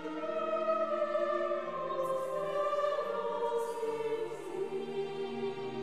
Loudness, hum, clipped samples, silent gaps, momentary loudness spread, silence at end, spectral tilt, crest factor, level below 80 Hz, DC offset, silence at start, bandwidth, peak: -35 LUFS; none; under 0.1%; none; 6 LU; 0 s; -5 dB/octave; 14 dB; -76 dBFS; 0.2%; 0 s; 14.5 kHz; -20 dBFS